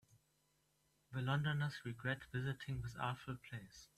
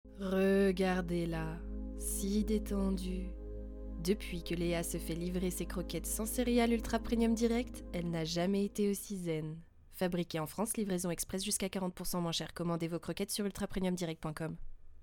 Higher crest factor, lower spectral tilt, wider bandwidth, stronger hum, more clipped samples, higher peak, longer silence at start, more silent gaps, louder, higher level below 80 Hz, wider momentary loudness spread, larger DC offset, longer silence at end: about the same, 20 dB vs 18 dB; about the same, -6 dB/octave vs -5 dB/octave; second, 13.5 kHz vs 19 kHz; neither; neither; second, -24 dBFS vs -18 dBFS; first, 1.1 s vs 0.05 s; neither; second, -43 LUFS vs -36 LUFS; second, -66 dBFS vs -46 dBFS; about the same, 11 LU vs 11 LU; neither; about the same, 0.1 s vs 0 s